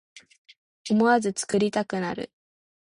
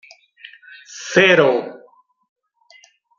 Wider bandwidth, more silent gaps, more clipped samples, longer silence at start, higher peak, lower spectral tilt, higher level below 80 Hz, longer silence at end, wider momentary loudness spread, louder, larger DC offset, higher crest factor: first, 11.5 kHz vs 7.6 kHz; first, 0.38-0.45 s, 0.58-0.85 s vs none; neither; second, 0.15 s vs 0.9 s; second, -8 dBFS vs 0 dBFS; about the same, -5 dB/octave vs -4 dB/octave; about the same, -66 dBFS vs -68 dBFS; second, 0.65 s vs 1.45 s; second, 16 LU vs 25 LU; second, -25 LUFS vs -14 LUFS; neither; about the same, 18 dB vs 20 dB